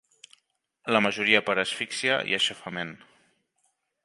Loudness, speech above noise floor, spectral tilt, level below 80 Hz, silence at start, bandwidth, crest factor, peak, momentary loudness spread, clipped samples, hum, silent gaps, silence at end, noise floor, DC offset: -25 LUFS; 48 dB; -3 dB/octave; -72 dBFS; 0.85 s; 11.5 kHz; 26 dB; -4 dBFS; 13 LU; under 0.1%; none; none; 1.1 s; -74 dBFS; under 0.1%